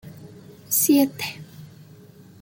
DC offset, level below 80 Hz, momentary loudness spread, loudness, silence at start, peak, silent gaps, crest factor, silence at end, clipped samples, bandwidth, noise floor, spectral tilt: under 0.1%; -66 dBFS; 26 LU; -21 LUFS; 0.05 s; -8 dBFS; none; 18 dB; 0.75 s; under 0.1%; 17 kHz; -47 dBFS; -3.5 dB/octave